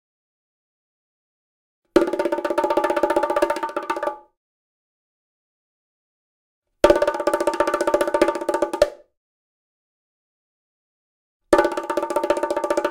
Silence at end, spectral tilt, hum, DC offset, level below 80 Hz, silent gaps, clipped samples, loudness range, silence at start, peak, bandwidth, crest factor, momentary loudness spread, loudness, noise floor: 0 s; -4 dB/octave; none; under 0.1%; -50 dBFS; 4.37-6.62 s, 9.17-11.40 s; under 0.1%; 7 LU; 1.95 s; 0 dBFS; 17 kHz; 22 dB; 7 LU; -21 LUFS; under -90 dBFS